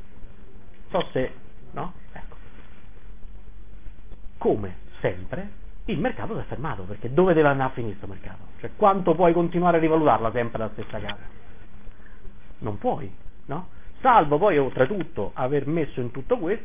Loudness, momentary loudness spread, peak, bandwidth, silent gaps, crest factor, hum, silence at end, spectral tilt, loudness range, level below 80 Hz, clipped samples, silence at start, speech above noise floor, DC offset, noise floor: -24 LUFS; 20 LU; -4 dBFS; 3.7 kHz; none; 20 dB; none; 0 s; -11 dB/octave; 12 LU; -44 dBFS; under 0.1%; 0.05 s; 22 dB; 3%; -46 dBFS